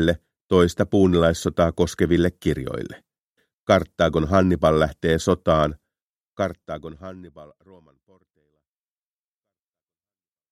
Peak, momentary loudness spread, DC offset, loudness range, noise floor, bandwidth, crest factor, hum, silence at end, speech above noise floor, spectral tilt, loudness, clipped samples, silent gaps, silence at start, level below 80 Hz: -2 dBFS; 16 LU; under 0.1%; 14 LU; under -90 dBFS; 14 kHz; 20 dB; none; 3.05 s; over 69 dB; -6.5 dB/octave; -21 LUFS; under 0.1%; 0.41-0.49 s, 3.18-3.35 s, 3.54-3.65 s, 6.02-6.37 s; 0 s; -42 dBFS